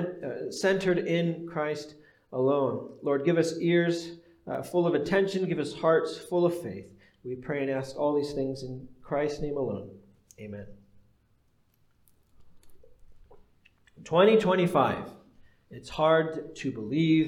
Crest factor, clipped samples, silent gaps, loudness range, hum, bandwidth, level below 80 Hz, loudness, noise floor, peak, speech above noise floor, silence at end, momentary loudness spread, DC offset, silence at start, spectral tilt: 20 dB; under 0.1%; none; 10 LU; none; 15 kHz; -60 dBFS; -28 LUFS; -67 dBFS; -10 dBFS; 39 dB; 0 s; 19 LU; under 0.1%; 0 s; -6.5 dB/octave